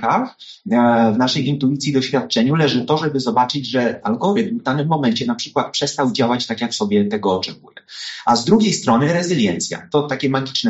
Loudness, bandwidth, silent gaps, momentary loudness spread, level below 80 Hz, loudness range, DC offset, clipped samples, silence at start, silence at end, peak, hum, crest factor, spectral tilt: -18 LUFS; 8 kHz; none; 6 LU; -58 dBFS; 2 LU; under 0.1%; under 0.1%; 0 s; 0 s; -2 dBFS; none; 16 dB; -4.5 dB/octave